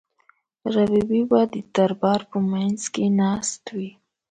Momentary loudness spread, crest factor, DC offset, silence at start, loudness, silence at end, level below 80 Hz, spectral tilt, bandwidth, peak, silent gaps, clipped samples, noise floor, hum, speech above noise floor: 12 LU; 16 dB; under 0.1%; 0.65 s; -22 LUFS; 0.4 s; -58 dBFS; -5.5 dB/octave; 9.4 kHz; -6 dBFS; none; under 0.1%; -62 dBFS; none; 40 dB